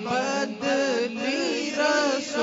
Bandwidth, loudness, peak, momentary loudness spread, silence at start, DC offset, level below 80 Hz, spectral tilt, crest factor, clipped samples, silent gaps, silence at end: 7.8 kHz; -25 LUFS; -12 dBFS; 4 LU; 0 s; under 0.1%; -72 dBFS; -3 dB/octave; 14 dB; under 0.1%; none; 0 s